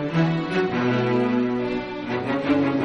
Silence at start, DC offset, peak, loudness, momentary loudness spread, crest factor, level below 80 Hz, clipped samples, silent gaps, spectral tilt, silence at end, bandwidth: 0 s; under 0.1%; -8 dBFS; -23 LUFS; 6 LU; 14 dB; -52 dBFS; under 0.1%; none; -8 dB/octave; 0 s; 7.6 kHz